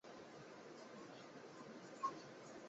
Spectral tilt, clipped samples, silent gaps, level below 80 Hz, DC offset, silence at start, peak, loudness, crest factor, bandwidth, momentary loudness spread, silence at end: -3.5 dB/octave; under 0.1%; none; under -90 dBFS; under 0.1%; 0.05 s; -32 dBFS; -53 LUFS; 22 dB; 8 kHz; 10 LU; 0 s